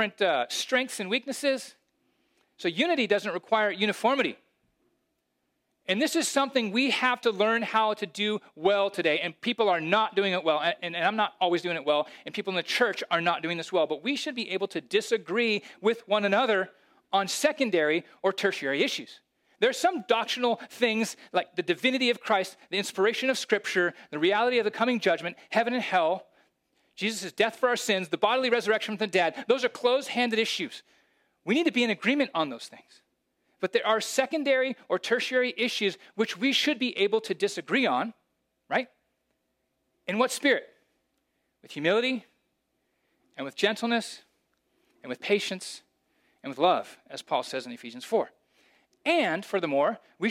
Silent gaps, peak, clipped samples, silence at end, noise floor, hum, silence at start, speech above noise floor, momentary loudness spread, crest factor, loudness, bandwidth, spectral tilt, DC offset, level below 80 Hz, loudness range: none; -8 dBFS; under 0.1%; 0 s; -78 dBFS; none; 0 s; 50 dB; 8 LU; 20 dB; -27 LUFS; 16 kHz; -3.5 dB/octave; under 0.1%; -84 dBFS; 5 LU